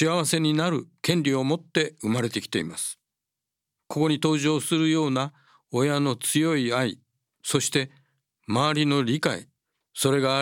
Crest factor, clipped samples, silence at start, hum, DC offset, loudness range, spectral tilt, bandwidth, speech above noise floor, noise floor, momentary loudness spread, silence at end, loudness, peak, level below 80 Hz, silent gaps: 20 dB; under 0.1%; 0 s; none; under 0.1%; 3 LU; -4.5 dB/octave; 17.5 kHz; 62 dB; -86 dBFS; 9 LU; 0 s; -25 LUFS; -6 dBFS; -72 dBFS; none